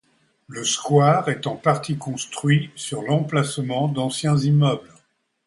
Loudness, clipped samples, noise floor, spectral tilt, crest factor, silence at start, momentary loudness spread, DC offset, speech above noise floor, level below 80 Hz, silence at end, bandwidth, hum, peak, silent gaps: -21 LUFS; under 0.1%; -62 dBFS; -5.5 dB/octave; 18 dB; 0.5 s; 11 LU; under 0.1%; 41 dB; -60 dBFS; 0.65 s; 11.5 kHz; none; -4 dBFS; none